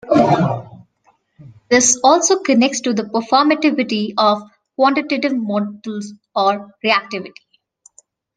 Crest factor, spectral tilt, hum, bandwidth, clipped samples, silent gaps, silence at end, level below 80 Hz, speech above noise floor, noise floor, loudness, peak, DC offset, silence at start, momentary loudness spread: 18 dB; -3.5 dB/octave; none; 10.5 kHz; under 0.1%; none; 1.05 s; -60 dBFS; 43 dB; -59 dBFS; -16 LUFS; 0 dBFS; under 0.1%; 0.05 s; 15 LU